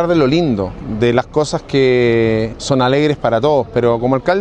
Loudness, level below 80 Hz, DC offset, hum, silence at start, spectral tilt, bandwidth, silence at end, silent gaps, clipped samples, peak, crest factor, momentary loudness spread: -15 LUFS; -38 dBFS; under 0.1%; none; 0 s; -6.5 dB/octave; 9.6 kHz; 0 s; none; under 0.1%; 0 dBFS; 14 dB; 5 LU